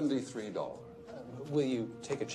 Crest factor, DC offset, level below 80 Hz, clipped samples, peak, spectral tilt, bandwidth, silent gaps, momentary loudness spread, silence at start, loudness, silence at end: 18 dB; under 0.1%; -72 dBFS; under 0.1%; -18 dBFS; -6 dB/octave; 11.5 kHz; none; 15 LU; 0 s; -37 LUFS; 0 s